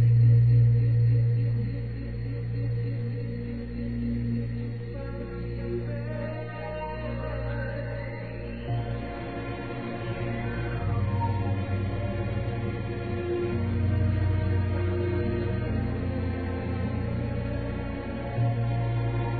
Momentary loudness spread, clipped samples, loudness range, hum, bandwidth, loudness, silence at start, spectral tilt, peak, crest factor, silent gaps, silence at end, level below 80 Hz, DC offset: 11 LU; under 0.1%; 6 LU; none; 4.5 kHz; -29 LUFS; 0 s; -12 dB/octave; -12 dBFS; 14 dB; none; 0 s; -40 dBFS; 0.3%